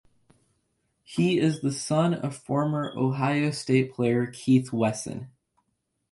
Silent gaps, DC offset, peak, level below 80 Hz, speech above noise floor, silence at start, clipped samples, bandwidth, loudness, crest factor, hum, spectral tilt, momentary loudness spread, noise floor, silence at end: none; under 0.1%; -10 dBFS; -64 dBFS; 52 dB; 1.1 s; under 0.1%; 11.5 kHz; -26 LUFS; 16 dB; none; -6.5 dB/octave; 8 LU; -77 dBFS; 0.8 s